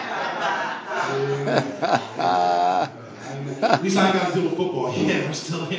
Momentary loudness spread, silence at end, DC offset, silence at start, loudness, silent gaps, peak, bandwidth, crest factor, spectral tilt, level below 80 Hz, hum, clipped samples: 8 LU; 0 s; under 0.1%; 0 s; -23 LUFS; none; 0 dBFS; 8 kHz; 22 dB; -5 dB/octave; -64 dBFS; none; under 0.1%